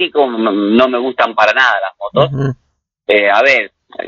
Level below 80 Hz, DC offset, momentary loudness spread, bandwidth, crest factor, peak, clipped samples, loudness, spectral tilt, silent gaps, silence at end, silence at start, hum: -52 dBFS; under 0.1%; 11 LU; 7.4 kHz; 14 dB; 0 dBFS; under 0.1%; -12 LUFS; -6 dB/octave; none; 0 s; 0 s; none